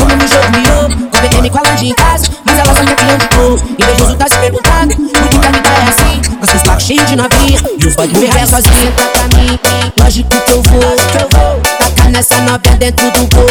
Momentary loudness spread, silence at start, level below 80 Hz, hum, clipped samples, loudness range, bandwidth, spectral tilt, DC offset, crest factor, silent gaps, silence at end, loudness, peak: 3 LU; 0 s; -12 dBFS; none; 0.7%; 0 LU; 19.5 kHz; -4 dB/octave; under 0.1%; 8 dB; none; 0 s; -8 LUFS; 0 dBFS